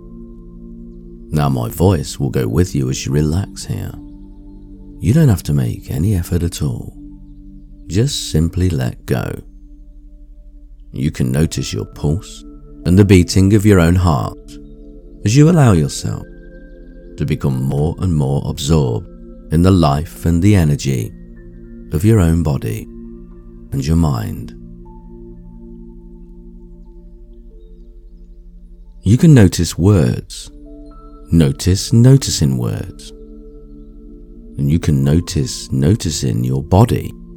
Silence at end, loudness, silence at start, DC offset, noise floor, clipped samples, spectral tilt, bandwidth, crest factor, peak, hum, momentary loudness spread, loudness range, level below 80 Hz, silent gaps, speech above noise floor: 0 s; -15 LUFS; 0 s; under 0.1%; -37 dBFS; under 0.1%; -6.5 dB/octave; 18 kHz; 16 dB; 0 dBFS; none; 24 LU; 8 LU; -32 dBFS; none; 23 dB